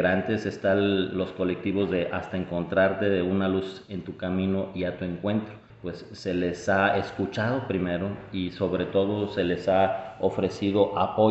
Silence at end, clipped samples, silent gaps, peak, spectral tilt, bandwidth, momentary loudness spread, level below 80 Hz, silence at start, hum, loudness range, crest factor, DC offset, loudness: 0 s; under 0.1%; none; -8 dBFS; -7 dB/octave; 8.2 kHz; 9 LU; -60 dBFS; 0 s; none; 3 LU; 18 dB; under 0.1%; -27 LUFS